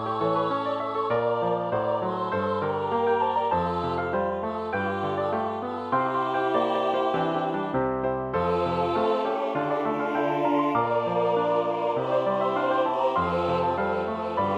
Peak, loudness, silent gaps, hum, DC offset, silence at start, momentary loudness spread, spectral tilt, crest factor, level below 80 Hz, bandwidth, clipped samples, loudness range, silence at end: -10 dBFS; -26 LUFS; none; none; under 0.1%; 0 s; 4 LU; -7.5 dB/octave; 14 dB; -56 dBFS; 8.8 kHz; under 0.1%; 2 LU; 0 s